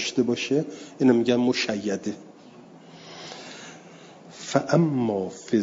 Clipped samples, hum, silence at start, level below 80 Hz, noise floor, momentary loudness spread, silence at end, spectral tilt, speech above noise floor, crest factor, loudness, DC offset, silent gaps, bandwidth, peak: under 0.1%; none; 0 s; -70 dBFS; -48 dBFS; 21 LU; 0 s; -5.5 dB/octave; 24 dB; 20 dB; -24 LUFS; under 0.1%; none; 7.8 kHz; -6 dBFS